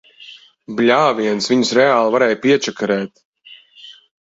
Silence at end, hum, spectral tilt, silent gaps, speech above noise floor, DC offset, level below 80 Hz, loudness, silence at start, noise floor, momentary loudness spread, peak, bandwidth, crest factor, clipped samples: 0.3 s; none; -4 dB/octave; 3.25-3.33 s; 29 dB; under 0.1%; -62 dBFS; -15 LUFS; 0.2 s; -45 dBFS; 8 LU; 0 dBFS; 8 kHz; 18 dB; under 0.1%